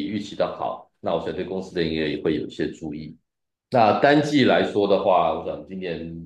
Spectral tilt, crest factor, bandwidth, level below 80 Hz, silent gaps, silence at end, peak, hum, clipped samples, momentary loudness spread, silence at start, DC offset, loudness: -6.5 dB/octave; 18 dB; 10 kHz; -58 dBFS; none; 0 s; -4 dBFS; none; under 0.1%; 14 LU; 0 s; under 0.1%; -22 LUFS